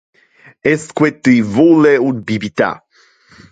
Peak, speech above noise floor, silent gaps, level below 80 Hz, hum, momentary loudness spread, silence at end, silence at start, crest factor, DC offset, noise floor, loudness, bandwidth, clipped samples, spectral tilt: 0 dBFS; 37 dB; none; -52 dBFS; none; 10 LU; 0.75 s; 0.65 s; 14 dB; under 0.1%; -49 dBFS; -13 LUFS; 9.2 kHz; under 0.1%; -6.5 dB/octave